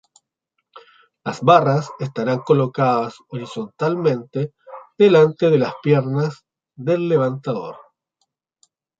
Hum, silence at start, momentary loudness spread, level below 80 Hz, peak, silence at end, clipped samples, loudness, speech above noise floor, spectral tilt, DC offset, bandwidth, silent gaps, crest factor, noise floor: none; 0.75 s; 16 LU; -64 dBFS; -2 dBFS; 1.2 s; under 0.1%; -19 LUFS; 58 dB; -7.5 dB/octave; under 0.1%; 7.8 kHz; none; 18 dB; -76 dBFS